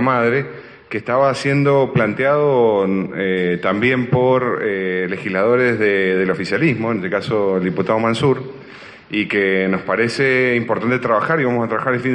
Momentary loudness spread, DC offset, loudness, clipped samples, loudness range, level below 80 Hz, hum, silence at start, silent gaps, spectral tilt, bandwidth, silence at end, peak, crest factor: 6 LU; under 0.1%; -17 LUFS; under 0.1%; 2 LU; -56 dBFS; none; 0 s; none; -7 dB/octave; 10.5 kHz; 0 s; -4 dBFS; 14 dB